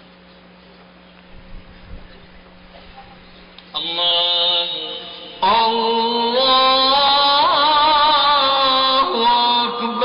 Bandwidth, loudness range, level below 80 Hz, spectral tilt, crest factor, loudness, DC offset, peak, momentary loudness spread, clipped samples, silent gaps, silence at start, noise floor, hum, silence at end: 5.4 kHz; 9 LU; -48 dBFS; -6 dB/octave; 12 dB; -15 LUFS; under 0.1%; -6 dBFS; 10 LU; under 0.1%; none; 1.35 s; -45 dBFS; none; 0 s